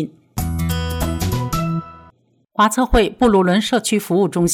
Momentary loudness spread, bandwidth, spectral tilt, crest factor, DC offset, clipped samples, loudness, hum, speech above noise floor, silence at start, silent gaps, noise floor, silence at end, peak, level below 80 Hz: 10 LU; 18 kHz; -5 dB/octave; 12 dB; under 0.1%; under 0.1%; -18 LUFS; none; 38 dB; 0 s; none; -53 dBFS; 0 s; -6 dBFS; -30 dBFS